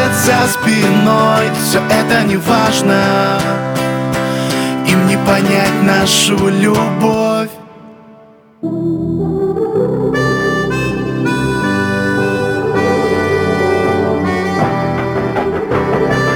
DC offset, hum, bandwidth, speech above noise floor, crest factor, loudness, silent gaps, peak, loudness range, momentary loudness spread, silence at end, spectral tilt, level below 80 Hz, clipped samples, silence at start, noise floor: under 0.1%; none; over 20 kHz; 30 dB; 12 dB; -13 LUFS; none; 0 dBFS; 5 LU; 6 LU; 0 s; -5 dB/octave; -40 dBFS; under 0.1%; 0 s; -42 dBFS